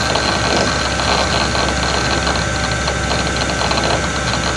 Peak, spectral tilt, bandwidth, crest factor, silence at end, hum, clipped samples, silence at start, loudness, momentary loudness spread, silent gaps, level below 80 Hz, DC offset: 0 dBFS; -3.5 dB/octave; 12 kHz; 16 dB; 0 s; none; under 0.1%; 0 s; -16 LUFS; 2 LU; none; -28 dBFS; under 0.1%